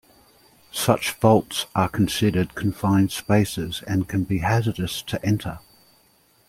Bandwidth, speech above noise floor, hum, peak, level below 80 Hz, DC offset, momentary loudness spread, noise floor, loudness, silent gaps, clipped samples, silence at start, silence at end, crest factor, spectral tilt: 16.5 kHz; 38 dB; none; -2 dBFS; -48 dBFS; under 0.1%; 8 LU; -59 dBFS; -22 LUFS; none; under 0.1%; 0.75 s; 0.9 s; 22 dB; -5.5 dB/octave